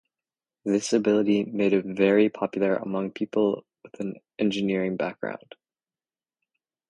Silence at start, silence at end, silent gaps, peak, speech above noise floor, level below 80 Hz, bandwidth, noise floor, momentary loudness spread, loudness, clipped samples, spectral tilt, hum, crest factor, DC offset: 0.65 s; 1.55 s; none; -8 dBFS; over 65 dB; -68 dBFS; 11.5 kHz; under -90 dBFS; 13 LU; -25 LUFS; under 0.1%; -6 dB/octave; none; 18 dB; under 0.1%